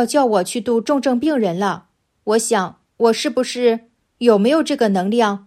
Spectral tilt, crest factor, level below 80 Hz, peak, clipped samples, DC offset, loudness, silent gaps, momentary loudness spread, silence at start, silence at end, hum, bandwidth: -4.5 dB/octave; 16 dB; -64 dBFS; -2 dBFS; under 0.1%; under 0.1%; -18 LUFS; none; 7 LU; 0 s; 0.1 s; none; 14.5 kHz